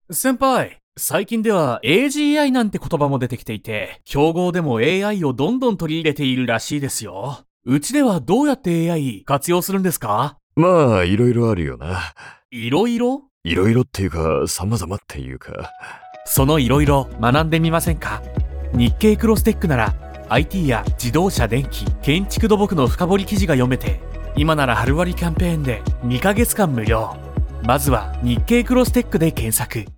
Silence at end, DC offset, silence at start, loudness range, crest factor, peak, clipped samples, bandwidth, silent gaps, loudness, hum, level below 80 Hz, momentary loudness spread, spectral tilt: 0 s; under 0.1%; 0.1 s; 3 LU; 16 dB; -2 dBFS; under 0.1%; 19 kHz; 0.83-0.92 s, 7.50-7.60 s, 10.43-10.50 s, 12.45-12.49 s, 13.31-13.41 s; -19 LUFS; none; -30 dBFS; 10 LU; -5.5 dB/octave